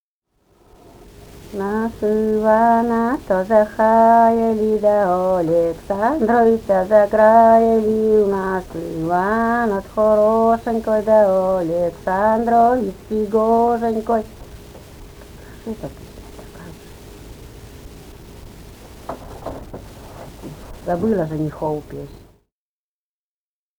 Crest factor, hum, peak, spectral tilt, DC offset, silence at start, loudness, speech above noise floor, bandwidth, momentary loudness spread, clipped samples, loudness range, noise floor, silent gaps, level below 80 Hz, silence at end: 18 dB; none; 0 dBFS; -7.5 dB/octave; under 0.1%; 1.35 s; -17 LUFS; over 74 dB; over 20 kHz; 22 LU; under 0.1%; 22 LU; under -90 dBFS; none; -44 dBFS; 1.6 s